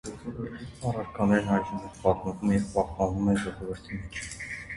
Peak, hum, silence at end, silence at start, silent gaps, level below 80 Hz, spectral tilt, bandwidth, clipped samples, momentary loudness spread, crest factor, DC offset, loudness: -8 dBFS; none; 0 s; 0.05 s; none; -46 dBFS; -6.5 dB/octave; 11.5 kHz; under 0.1%; 12 LU; 20 dB; under 0.1%; -29 LUFS